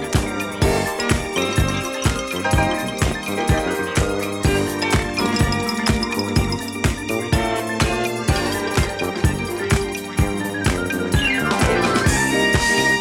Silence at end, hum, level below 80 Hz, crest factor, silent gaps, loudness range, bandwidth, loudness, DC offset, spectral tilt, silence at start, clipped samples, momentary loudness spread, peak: 0 s; none; -28 dBFS; 18 dB; none; 2 LU; 18 kHz; -20 LUFS; under 0.1%; -4.5 dB/octave; 0 s; under 0.1%; 5 LU; -2 dBFS